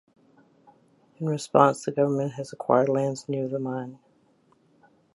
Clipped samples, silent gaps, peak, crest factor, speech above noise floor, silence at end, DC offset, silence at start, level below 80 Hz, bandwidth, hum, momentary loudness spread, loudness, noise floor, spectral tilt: under 0.1%; none; -2 dBFS; 24 dB; 39 dB; 1.2 s; under 0.1%; 1.2 s; -76 dBFS; 11.5 kHz; none; 13 LU; -25 LUFS; -63 dBFS; -6.5 dB/octave